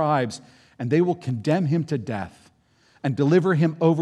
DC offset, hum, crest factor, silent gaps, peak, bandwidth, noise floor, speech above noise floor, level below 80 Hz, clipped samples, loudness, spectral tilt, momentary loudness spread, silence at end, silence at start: under 0.1%; none; 18 dB; none; -6 dBFS; 10.5 kHz; -60 dBFS; 38 dB; -66 dBFS; under 0.1%; -23 LUFS; -8 dB/octave; 13 LU; 0 s; 0 s